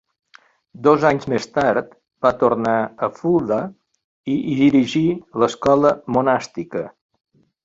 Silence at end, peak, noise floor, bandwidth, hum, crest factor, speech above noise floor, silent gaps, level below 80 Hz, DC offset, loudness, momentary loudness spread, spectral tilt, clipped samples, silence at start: 0.75 s; -2 dBFS; -52 dBFS; 7.8 kHz; none; 18 dB; 34 dB; 4.04-4.24 s; -54 dBFS; under 0.1%; -19 LUFS; 12 LU; -6.5 dB/octave; under 0.1%; 0.8 s